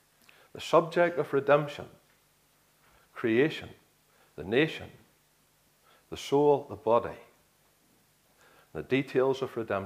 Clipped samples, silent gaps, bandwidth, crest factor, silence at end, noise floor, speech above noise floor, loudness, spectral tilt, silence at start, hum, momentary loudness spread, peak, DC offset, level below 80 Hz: under 0.1%; none; 15.5 kHz; 22 dB; 0 s; -67 dBFS; 39 dB; -28 LUFS; -6 dB/octave; 0.55 s; none; 24 LU; -10 dBFS; under 0.1%; -68 dBFS